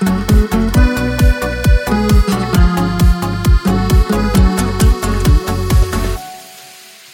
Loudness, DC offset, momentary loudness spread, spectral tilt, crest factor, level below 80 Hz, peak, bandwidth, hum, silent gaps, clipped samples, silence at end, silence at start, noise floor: -14 LUFS; under 0.1%; 6 LU; -6 dB/octave; 12 dB; -14 dBFS; 0 dBFS; 17 kHz; none; none; under 0.1%; 0.45 s; 0 s; -38 dBFS